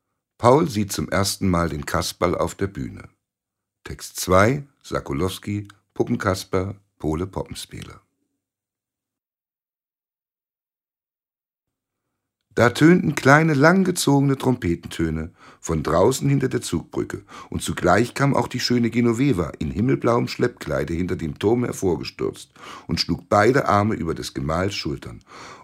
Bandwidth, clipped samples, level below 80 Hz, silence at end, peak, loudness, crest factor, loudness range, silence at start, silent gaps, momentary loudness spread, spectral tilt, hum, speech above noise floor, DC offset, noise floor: 16 kHz; under 0.1%; -44 dBFS; 0.05 s; 0 dBFS; -21 LUFS; 22 dB; 10 LU; 0.4 s; none; 16 LU; -5.5 dB/octave; none; over 69 dB; under 0.1%; under -90 dBFS